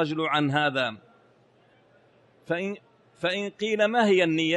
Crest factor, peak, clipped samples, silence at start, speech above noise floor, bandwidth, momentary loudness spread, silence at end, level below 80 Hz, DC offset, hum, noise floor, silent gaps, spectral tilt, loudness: 18 dB; -10 dBFS; under 0.1%; 0 s; 36 dB; 11 kHz; 10 LU; 0 s; -72 dBFS; under 0.1%; none; -60 dBFS; none; -5.5 dB/octave; -25 LUFS